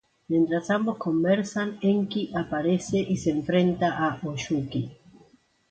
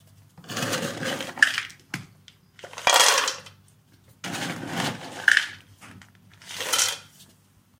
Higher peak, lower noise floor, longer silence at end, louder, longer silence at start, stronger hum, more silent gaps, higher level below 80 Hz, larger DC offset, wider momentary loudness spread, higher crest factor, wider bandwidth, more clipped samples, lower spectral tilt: second, -10 dBFS vs 0 dBFS; about the same, -59 dBFS vs -59 dBFS; first, 0.75 s vs 0.55 s; second, -26 LUFS vs -23 LUFS; about the same, 0.3 s vs 0.4 s; neither; neither; first, -58 dBFS vs -68 dBFS; neither; second, 6 LU vs 20 LU; second, 16 dB vs 26 dB; second, 9 kHz vs 16.5 kHz; neither; first, -6.5 dB/octave vs -1 dB/octave